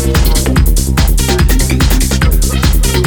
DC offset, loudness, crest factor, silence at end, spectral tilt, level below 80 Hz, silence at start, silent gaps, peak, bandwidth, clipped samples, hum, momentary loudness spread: under 0.1%; -11 LUFS; 10 dB; 0 s; -4.5 dB/octave; -10 dBFS; 0 s; none; 0 dBFS; over 20 kHz; under 0.1%; none; 1 LU